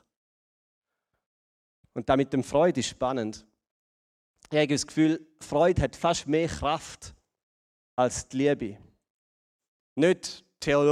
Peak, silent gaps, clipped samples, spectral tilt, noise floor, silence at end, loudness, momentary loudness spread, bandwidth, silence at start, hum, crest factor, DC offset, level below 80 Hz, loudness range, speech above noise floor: -8 dBFS; 3.71-4.34 s, 7.43-7.97 s, 9.10-9.60 s, 9.68-9.96 s; under 0.1%; -5 dB/octave; under -90 dBFS; 0 s; -27 LUFS; 14 LU; 13 kHz; 1.95 s; none; 20 dB; under 0.1%; -50 dBFS; 3 LU; over 64 dB